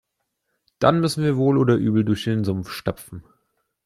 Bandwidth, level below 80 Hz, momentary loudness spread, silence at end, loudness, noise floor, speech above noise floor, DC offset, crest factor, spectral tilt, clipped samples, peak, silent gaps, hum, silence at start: 15 kHz; -54 dBFS; 14 LU; 0.65 s; -21 LUFS; -76 dBFS; 56 dB; under 0.1%; 20 dB; -7 dB/octave; under 0.1%; -4 dBFS; none; none; 0.8 s